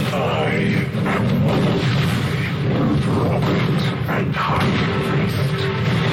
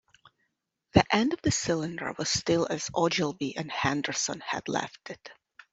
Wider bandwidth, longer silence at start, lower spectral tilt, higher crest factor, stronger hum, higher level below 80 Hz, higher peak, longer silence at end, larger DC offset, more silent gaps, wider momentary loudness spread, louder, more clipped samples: first, 16 kHz vs 8.2 kHz; second, 0 s vs 0.95 s; first, -7 dB/octave vs -4 dB/octave; second, 8 dB vs 24 dB; neither; first, -40 dBFS vs -54 dBFS; second, -10 dBFS vs -4 dBFS; second, 0 s vs 0.4 s; neither; neither; second, 3 LU vs 9 LU; first, -19 LUFS vs -28 LUFS; neither